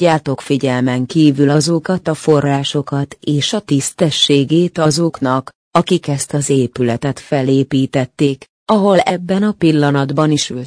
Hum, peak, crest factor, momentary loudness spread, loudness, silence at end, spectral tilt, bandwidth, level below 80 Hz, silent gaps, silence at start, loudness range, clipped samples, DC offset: none; 0 dBFS; 14 dB; 6 LU; -15 LUFS; 0 s; -5.5 dB/octave; 10.5 kHz; -52 dBFS; 5.55-5.71 s, 8.49-8.66 s; 0 s; 2 LU; under 0.1%; under 0.1%